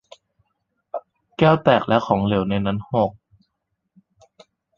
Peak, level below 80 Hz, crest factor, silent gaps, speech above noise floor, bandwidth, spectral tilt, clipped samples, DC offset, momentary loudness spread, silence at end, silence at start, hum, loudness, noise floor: -2 dBFS; -50 dBFS; 22 dB; none; 58 dB; 7 kHz; -8 dB/octave; under 0.1%; under 0.1%; 18 LU; 1.65 s; 0.95 s; none; -19 LUFS; -76 dBFS